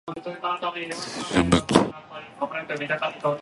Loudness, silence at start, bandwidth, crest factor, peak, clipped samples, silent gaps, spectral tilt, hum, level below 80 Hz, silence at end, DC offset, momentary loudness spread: -25 LUFS; 0.05 s; 11.5 kHz; 26 dB; 0 dBFS; under 0.1%; none; -5 dB/octave; none; -46 dBFS; 0 s; under 0.1%; 12 LU